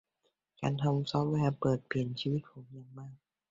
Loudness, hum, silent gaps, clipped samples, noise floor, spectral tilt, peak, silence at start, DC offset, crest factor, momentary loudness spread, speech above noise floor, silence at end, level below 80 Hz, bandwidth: -33 LUFS; none; none; under 0.1%; -80 dBFS; -7.5 dB/octave; -16 dBFS; 0.6 s; under 0.1%; 18 dB; 20 LU; 47 dB; 0.35 s; -64 dBFS; 7.6 kHz